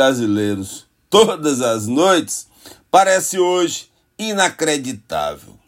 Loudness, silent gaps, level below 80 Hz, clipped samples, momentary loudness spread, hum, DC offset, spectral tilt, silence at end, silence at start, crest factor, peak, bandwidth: -17 LUFS; none; -58 dBFS; under 0.1%; 13 LU; none; under 0.1%; -3.5 dB/octave; 0.3 s; 0 s; 18 dB; 0 dBFS; 16.5 kHz